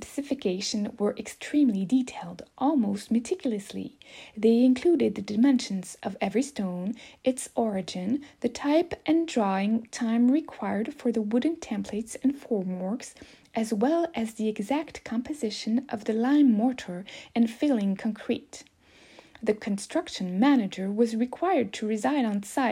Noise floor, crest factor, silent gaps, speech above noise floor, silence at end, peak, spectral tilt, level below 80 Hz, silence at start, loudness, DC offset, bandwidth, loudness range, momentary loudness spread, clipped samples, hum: -55 dBFS; 16 dB; none; 29 dB; 0 s; -10 dBFS; -5.5 dB/octave; -66 dBFS; 0 s; -27 LUFS; under 0.1%; 14 kHz; 4 LU; 11 LU; under 0.1%; none